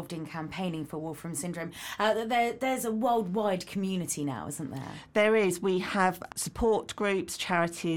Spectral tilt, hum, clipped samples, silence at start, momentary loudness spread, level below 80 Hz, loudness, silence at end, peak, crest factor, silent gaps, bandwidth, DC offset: -4.5 dB/octave; none; under 0.1%; 0 s; 11 LU; -54 dBFS; -30 LUFS; 0 s; -10 dBFS; 18 dB; none; 18.5 kHz; under 0.1%